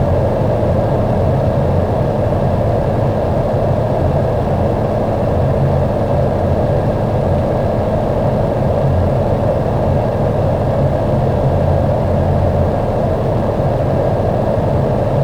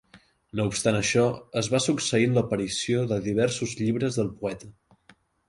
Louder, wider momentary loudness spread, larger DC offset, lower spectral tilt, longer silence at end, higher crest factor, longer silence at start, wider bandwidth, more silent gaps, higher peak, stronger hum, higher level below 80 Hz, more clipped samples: first, -15 LUFS vs -26 LUFS; second, 1 LU vs 7 LU; neither; first, -9.5 dB/octave vs -4.5 dB/octave; second, 0 s vs 0.8 s; second, 10 dB vs 18 dB; second, 0 s vs 0.15 s; second, 10 kHz vs 11.5 kHz; neither; first, -4 dBFS vs -8 dBFS; neither; first, -26 dBFS vs -56 dBFS; neither